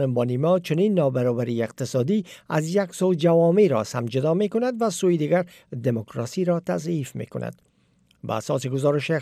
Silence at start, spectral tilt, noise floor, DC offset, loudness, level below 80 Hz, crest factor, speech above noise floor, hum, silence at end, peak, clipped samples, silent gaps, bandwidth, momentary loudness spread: 0 s; -6.5 dB/octave; -62 dBFS; under 0.1%; -23 LUFS; -68 dBFS; 14 dB; 40 dB; none; 0 s; -8 dBFS; under 0.1%; none; 15 kHz; 11 LU